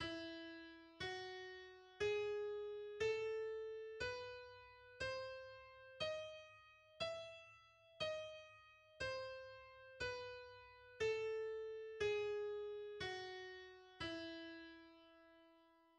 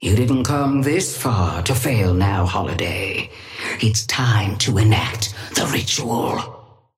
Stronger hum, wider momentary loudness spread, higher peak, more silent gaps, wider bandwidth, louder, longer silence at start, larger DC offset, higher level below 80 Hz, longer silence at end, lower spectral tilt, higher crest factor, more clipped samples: neither; first, 19 LU vs 7 LU; second, -30 dBFS vs -4 dBFS; neither; second, 9.8 kHz vs 16.5 kHz; second, -47 LUFS vs -19 LUFS; about the same, 0 s vs 0 s; neither; second, -72 dBFS vs -42 dBFS; about the same, 0.25 s vs 0.35 s; about the same, -4 dB/octave vs -4.5 dB/octave; about the same, 18 dB vs 16 dB; neither